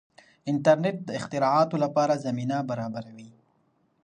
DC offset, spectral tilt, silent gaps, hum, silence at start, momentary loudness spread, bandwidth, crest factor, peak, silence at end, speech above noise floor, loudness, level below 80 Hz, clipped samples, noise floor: under 0.1%; -6.5 dB/octave; none; none; 0.45 s; 13 LU; 10 kHz; 20 dB; -6 dBFS; 0.75 s; 43 dB; -26 LUFS; -70 dBFS; under 0.1%; -68 dBFS